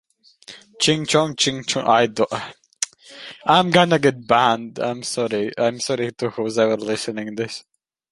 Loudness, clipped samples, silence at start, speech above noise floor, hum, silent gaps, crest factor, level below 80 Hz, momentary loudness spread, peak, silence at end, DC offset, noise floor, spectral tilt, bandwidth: -20 LUFS; under 0.1%; 0.5 s; 21 dB; none; none; 20 dB; -62 dBFS; 11 LU; 0 dBFS; 0.5 s; under 0.1%; -41 dBFS; -4 dB/octave; 11.5 kHz